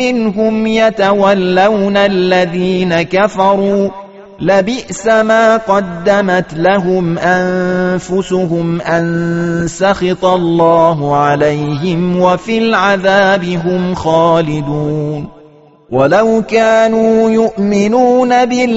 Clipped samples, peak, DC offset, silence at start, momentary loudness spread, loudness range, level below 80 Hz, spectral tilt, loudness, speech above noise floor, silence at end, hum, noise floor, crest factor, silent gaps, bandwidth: under 0.1%; 0 dBFS; 0.4%; 0 s; 6 LU; 2 LU; -44 dBFS; -5 dB/octave; -12 LUFS; 30 dB; 0 s; none; -41 dBFS; 12 dB; none; 8 kHz